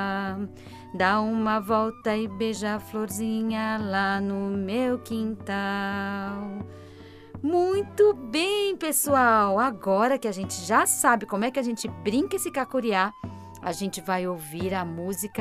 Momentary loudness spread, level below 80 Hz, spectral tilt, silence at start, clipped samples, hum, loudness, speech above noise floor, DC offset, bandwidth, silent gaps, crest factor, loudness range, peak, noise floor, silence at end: 11 LU; -60 dBFS; -4 dB/octave; 0 s; under 0.1%; none; -26 LUFS; 20 dB; under 0.1%; 16 kHz; none; 20 dB; 6 LU; -6 dBFS; -46 dBFS; 0 s